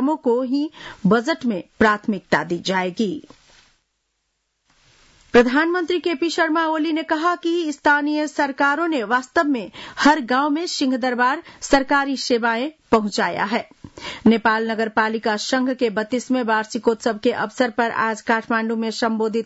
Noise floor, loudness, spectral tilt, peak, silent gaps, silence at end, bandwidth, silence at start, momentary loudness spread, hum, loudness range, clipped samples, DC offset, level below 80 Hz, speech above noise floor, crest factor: -73 dBFS; -20 LUFS; -4.5 dB/octave; -4 dBFS; none; 0 s; 8 kHz; 0 s; 6 LU; none; 3 LU; under 0.1%; under 0.1%; -52 dBFS; 53 dB; 16 dB